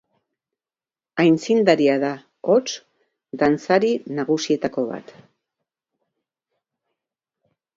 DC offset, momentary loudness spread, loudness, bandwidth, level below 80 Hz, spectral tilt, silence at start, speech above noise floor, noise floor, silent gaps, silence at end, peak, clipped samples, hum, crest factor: under 0.1%; 14 LU; -20 LUFS; 7.8 kHz; -64 dBFS; -5.5 dB/octave; 1.15 s; over 71 dB; under -90 dBFS; none; 2.75 s; -2 dBFS; under 0.1%; none; 20 dB